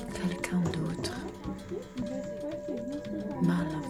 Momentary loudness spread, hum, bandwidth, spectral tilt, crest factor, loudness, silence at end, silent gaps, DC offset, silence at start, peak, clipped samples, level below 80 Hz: 10 LU; none; 13.5 kHz; -6.5 dB/octave; 18 dB; -34 LUFS; 0 s; none; under 0.1%; 0 s; -16 dBFS; under 0.1%; -52 dBFS